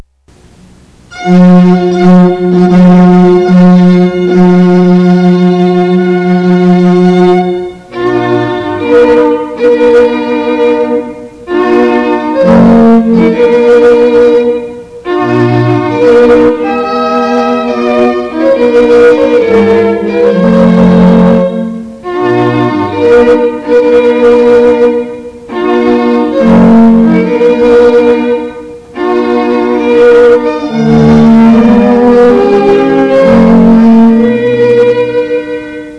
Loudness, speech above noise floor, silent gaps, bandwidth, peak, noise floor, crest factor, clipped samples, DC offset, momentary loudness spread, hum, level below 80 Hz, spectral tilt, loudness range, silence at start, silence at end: -6 LUFS; 38 dB; none; 8.8 kHz; 0 dBFS; -41 dBFS; 6 dB; 10%; under 0.1%; 9 LU; none; -34 dBFS; -8.5 dB/octave; 3 LU; 1.1 s; 0 s